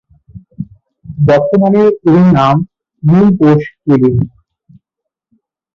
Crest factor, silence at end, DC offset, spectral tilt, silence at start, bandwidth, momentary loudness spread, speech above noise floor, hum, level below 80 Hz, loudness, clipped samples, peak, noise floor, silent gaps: 10 dB; 1.5 s; under 0.1%; -9.5 dB/octave; 0.35 s; 6.8 kHz; 20 LU; 71 dB; none; -42 dBFS; -10 LUFS; under 0.1%; -2 dBFS; -79 dBFS; none